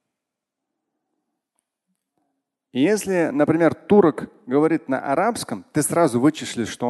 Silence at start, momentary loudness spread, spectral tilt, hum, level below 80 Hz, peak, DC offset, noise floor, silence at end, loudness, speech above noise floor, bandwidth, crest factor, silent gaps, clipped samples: 2.75 s; 11 LU; -5.5 dB/octave; none; -60 dBFS; -4 dBFS; under 0.1%; -84 dBFS; 0 s; -20 LUFS; 64 dB; 12.5 kHz; 18 dB; none; under 0.1%